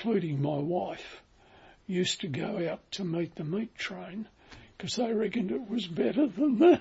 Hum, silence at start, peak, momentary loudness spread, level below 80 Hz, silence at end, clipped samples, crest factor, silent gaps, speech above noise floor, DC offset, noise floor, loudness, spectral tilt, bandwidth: none; 0 s; -10 dBFS; 14 LU; -66 dBFS; 0 s; under 0.1%; 20 dB; none; 28 dB; under 0.1%; -57 dBFS; -31 LUFS; -6 dB/octave; 8 kHz